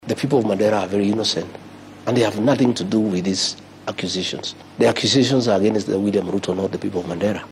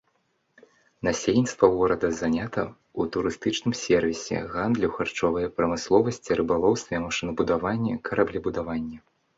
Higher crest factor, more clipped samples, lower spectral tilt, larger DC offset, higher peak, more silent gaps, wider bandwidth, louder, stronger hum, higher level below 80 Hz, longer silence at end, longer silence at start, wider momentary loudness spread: second, 14 dB vs 22 dB; neither; about the same, -5 dB/octave vs -5.5 dB/octave; neither; about the same, -6 dBFS vs -4 dBFS; neither; first, 13.5 kHz vs 8 kHz; first, -20 LUFS vs -25 LUFS; neither; second, -58 dBFS vs -50 dBFS; second, 0 s vs 0.4 s; second, 0.05 s vs 1.05 s; about the same, 10 LU vs 8 LU